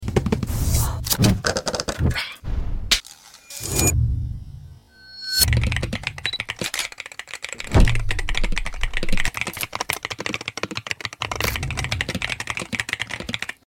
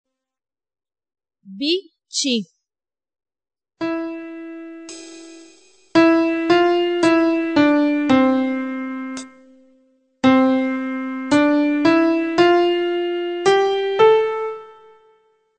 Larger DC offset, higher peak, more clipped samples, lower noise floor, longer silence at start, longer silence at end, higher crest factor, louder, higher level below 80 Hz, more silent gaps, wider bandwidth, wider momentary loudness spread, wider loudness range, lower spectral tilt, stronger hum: neither; about the same, -2 dBFS vs -2 dBFS; neither; second, -45 dBFS vs under -90 dBFS; second, 0 s vs 1.5 s; second, 0.15 s vs 0.9 s; about the same, 22 dB vs 18 dB; second, -24 LUFS vs -18 LUFS; first, -28 dBFS vs -60 dBFS; neither; first, 17 kHz vs 9 kHz; second, 13 LU vs 19 LU; second, 4 LU vs 10 LU; about the same, -3.5 dB/octave vs -4 dB/octave; neither